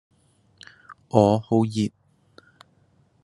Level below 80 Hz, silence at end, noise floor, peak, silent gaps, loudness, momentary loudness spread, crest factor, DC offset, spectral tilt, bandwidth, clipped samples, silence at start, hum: -64 dBFS; 1.35 s; -62 dBFS; -2 dBFS; none; -22 LUFS; 10 LU; 24 dB; under 0.1%; -7.5 dB/octave; 11.5 kHz; under 0.1%; 0.9 s; none